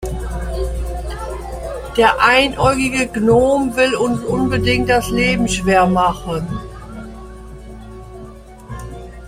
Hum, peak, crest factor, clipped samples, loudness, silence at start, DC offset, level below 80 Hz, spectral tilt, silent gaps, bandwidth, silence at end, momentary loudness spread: none; 0 dBFS; 16 dB; under 0.1%; -16 LUFS; 0 s; under 0.1%; -30 dBFS; -5 dB/octave; none; 16 kHz; 0 s; 23 LU